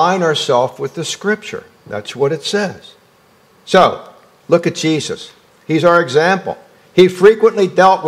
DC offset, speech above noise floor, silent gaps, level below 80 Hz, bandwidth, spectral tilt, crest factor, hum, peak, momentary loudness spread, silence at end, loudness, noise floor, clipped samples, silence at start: under 0.1%; 37 dB; none; -58 dBFS; 14 kHz; -5 dB/octave; 14 dB; none; 0 dBFS; 17 LU; 0 s; -14 LUFS; -50 dBFS; 0.4%; 0 s